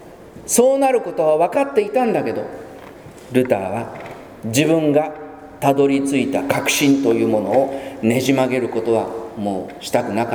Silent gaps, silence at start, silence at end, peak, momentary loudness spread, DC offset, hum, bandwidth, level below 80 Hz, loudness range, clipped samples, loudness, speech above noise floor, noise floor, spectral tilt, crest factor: none; 0 s; 0 s; 0 dBFS; 16 LU; under 0.1%; none; over 20 kHz; -54 dBFS; 4 LU; under 0.1%; -18 LUFS; 21 dB; -38 dBFS; -4.5 dB/octave; 18 dB